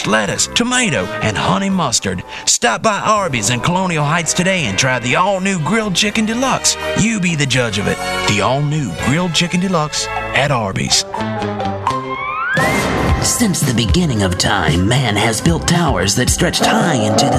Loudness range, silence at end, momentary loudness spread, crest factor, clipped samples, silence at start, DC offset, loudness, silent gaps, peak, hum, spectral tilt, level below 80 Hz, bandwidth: 2 LU; 0 s; 5 LU; 14 dB; under 0.1%; 0 s; under 0.1%; -15 LUFS; none; 0 dBFS; none; -3.5 dB/octave; -32 dBFS; 14 kHz